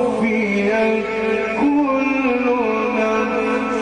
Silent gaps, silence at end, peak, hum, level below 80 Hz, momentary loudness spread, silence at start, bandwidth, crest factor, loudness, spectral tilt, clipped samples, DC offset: none; 0 s; -8 dBFS; none; -50 dBFS; 3 LU; 0 s; 9.8 kHz; 10 dB; -18 LUFS; -6 dB/octave; under 0.1%; under 0.1%